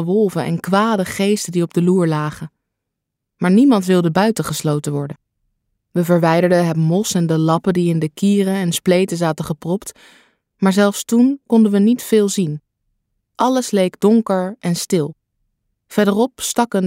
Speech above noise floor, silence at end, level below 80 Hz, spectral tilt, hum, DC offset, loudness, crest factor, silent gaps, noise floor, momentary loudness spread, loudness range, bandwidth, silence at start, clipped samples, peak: 63 dB; 0 s; -58 dBFS; -6 dB/octave; none; under 0.1%; -17 LUFS; 14 dB; none; -79 dBFS; 10 LU; 2 LU; 16 kHz; 0 s; under 0.1%; -2 dBFS